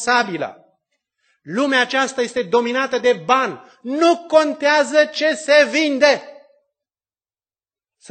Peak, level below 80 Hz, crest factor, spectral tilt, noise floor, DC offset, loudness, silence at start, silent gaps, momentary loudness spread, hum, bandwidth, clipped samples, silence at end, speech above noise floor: 0 dBFS; -70 dBFS; 18 dB; -3 dB/octave; under -90 dBFS; under 0.1%; -17 LUFS; 0 s; none; 10 LU; none; 9.2 kHz; under 0.1%; 1.75 s; over 73 dB